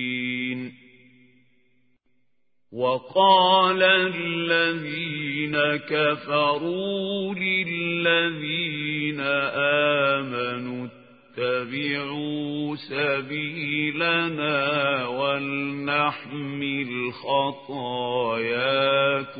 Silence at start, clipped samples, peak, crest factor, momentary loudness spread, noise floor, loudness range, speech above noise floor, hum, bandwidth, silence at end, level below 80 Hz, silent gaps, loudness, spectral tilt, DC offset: 0 s; under 0.1%; -6 dBFS; 20 dB; 10 LU; -78 dBFS; 5 LU; 54 dB; none; 5 kHz; 0 s; -72 dBFS; none; -23 LUFS; -9.5 dB/octave; under 0.1%